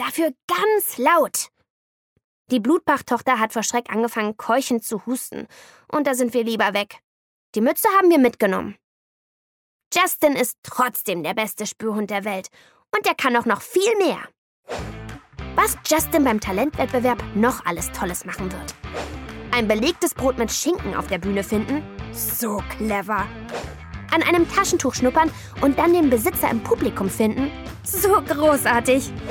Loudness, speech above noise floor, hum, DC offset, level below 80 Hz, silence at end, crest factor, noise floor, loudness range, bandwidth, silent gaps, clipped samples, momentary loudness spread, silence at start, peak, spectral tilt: -21 LUFS; over 69 dB; none; under 0.1%; -44 dBFS; 0 s; 16 dB; under -90 dBFS; 4 LU; 19.5 kHz; 0.43-0.48 s, 1.70-2.16 s, 2.24-2.45 s, 7.04-7.53 s, 8.84-9.80 s, 9.86-9.91 s, 10.58-10.63 s, 14.38-14.63 s; under 0.1%; 14 LU; 0 s; -6 dBFS; -4 dB/octave